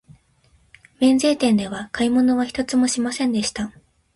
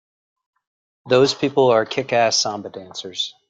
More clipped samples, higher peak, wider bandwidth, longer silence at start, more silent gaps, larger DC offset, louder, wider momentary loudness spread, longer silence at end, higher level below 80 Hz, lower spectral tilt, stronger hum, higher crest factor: neither; second, -6 dBFS vs -2 dBFS; first, 11.5 kHz vs 9.2 kHz; about the same, 1 s vs 1.05 s; neither; neither; about the same, -20 LUFS vs -18 LUFS; second, 9 LU vs 15 LU; first, 0.45 s vs 0.2 s; first, -54 dBFS vs -64 dBFS; about the same, -4 dB/octave vs -3.5 dB/octave; neither; about the same, 16 dB vs 18 dB